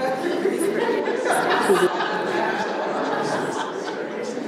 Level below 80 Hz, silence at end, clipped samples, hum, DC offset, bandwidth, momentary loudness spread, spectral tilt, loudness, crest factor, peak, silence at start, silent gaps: -70 dBFS; 0 s; under 0.1%; none; under 0.1%; 15.5 kHz; 9 LU; -4 dB/octave; -23 LUFS; 16 dB; -8 dBFS; 0 s; none